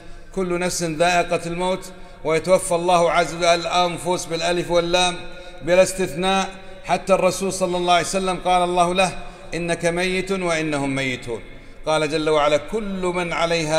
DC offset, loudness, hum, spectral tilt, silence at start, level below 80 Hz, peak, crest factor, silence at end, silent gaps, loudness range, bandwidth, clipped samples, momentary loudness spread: under 0.1%; -20 LUFS; none; -4 dB/octave; 0 s; -40 dBFS; -4 dBFS; 18 dB; 0 s; none; 3 LU; 15.5 kHz; under 0.1%; 11 LU